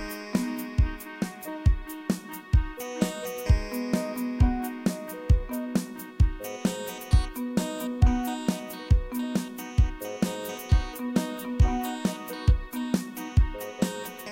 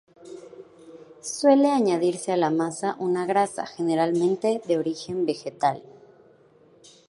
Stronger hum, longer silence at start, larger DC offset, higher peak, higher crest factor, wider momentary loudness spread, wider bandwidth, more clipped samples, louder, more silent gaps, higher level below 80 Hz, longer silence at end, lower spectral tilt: neither; second, 0 s vs 0.25 s; neither; about the same, -8 dBFS vs -6 dBFS; about the same, 18 dB vs 18 dB; second, 7 LU vs 17 LU; first, 17 kHz vs 11.5 kHz; neither; second, -29 LUFS vs -24 LUFS; neither; first, -30 dBFS vs -74 dBFS; second, 0 s vs 1.25 s; about the same, -6.5 dB/octave vs -5.5 dB/octave